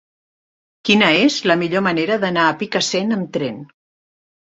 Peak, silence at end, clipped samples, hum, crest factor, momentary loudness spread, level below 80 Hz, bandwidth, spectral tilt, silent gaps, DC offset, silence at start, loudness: -2 dBFS; 0.75 s; under 0.1%; none; 18 dB; 11 LU; -60 dBFS; 8.2 kHz; -4 dB/octave; none; under 0.1%; 0.85 s; -17 LUFS